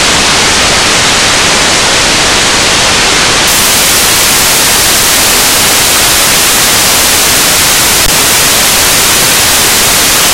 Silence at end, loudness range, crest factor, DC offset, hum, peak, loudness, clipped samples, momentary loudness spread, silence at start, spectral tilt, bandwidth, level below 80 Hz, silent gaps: 0 s; 1 LU; 6 dB; under 0.1%; none; 0 dBFS; -4 LUFS; 2%; 1 LU; 0 s; -0.5 dB/octave; over 20 kHz; -26 dBFS; none